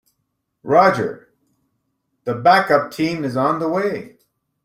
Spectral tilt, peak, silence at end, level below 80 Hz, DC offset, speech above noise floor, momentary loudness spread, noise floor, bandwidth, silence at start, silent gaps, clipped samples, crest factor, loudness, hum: -6 dB/octave; -2 dBFS; 0.55 s; -60 dBFS; under 0.1%; 56 dB; 14 LU; -73 dBFS; 16 kHz; 0.65 s; none; under 0.1%; 18 dB; -18 LUFS; none